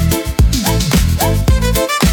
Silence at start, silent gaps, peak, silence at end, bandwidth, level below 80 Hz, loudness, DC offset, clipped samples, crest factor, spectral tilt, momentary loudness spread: 0 s; none; 0 dBFS; 0 s; 18 kHz; -16 dBFS; -14 LUFS; under 0.1%; under 0.1%; 12 dB; -5 dB/octave; 1 LU